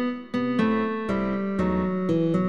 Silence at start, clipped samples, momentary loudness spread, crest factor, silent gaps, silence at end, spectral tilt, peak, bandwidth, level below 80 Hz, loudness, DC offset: 0 s; under 0.1%; 3 LU; 12 dB; none; 0 s; -8.5 dB/octave; -12 dBFS; 7.8 kHz; -48 dBFS; -25 LUFS; 0.4%